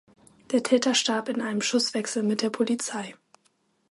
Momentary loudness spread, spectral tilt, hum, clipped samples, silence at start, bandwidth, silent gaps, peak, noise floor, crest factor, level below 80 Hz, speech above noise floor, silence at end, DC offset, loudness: 7 LU; -3 dB/octave; none; under 0.1%; 0.5 s; 11.5 kHz; none; -8 dBFS; -69 dBFS; 20 dB; -76 dBFS; 43 dB; 0.8 s; under 0.1%; -25 LUFS